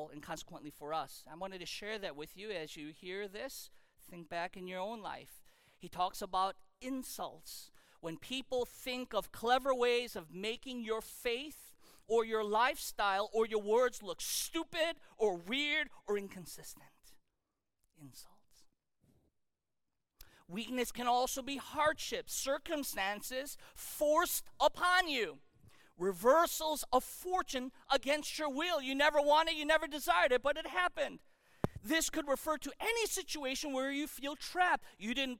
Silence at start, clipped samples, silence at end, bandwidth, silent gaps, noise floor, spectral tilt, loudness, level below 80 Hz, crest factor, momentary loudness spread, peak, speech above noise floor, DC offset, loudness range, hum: 0 s; under 0.1%; 0 s; 17.5 kHz; none; -89 dBFS; -2.5 dB/octave; -36 LUFS; -62 dBFS; 20 dB; 16 LU; -16 dBFS; 53 dB; under 0.1%; 11 LU; none